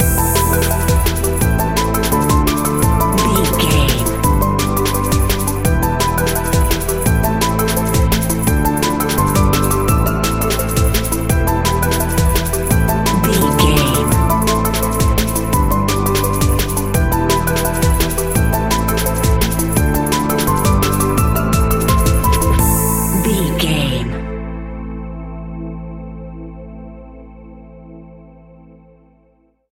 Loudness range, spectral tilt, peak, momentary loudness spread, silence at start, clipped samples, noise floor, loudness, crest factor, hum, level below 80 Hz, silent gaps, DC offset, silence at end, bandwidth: 8 LU; -5 dB/octave; 0 dBFS; 11 LU; 0 s; under 0.1%; -56 dBFS; -15 LUFS; 14 dB; none; -20 dBFS; none; under 0.1%; 1.5 s; 17 kHz